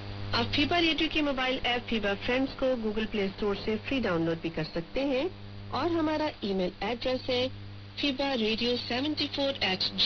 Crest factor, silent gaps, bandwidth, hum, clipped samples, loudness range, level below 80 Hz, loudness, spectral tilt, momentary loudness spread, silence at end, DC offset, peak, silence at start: 16 dB; none; 6.8 kHz; none; under 0.1%; 3 LU; -48 dBFS; -29 LUFS; -5.5 dB/octave; 6 LU; 0 s; under 0.1%; -14 dBFS; 0 s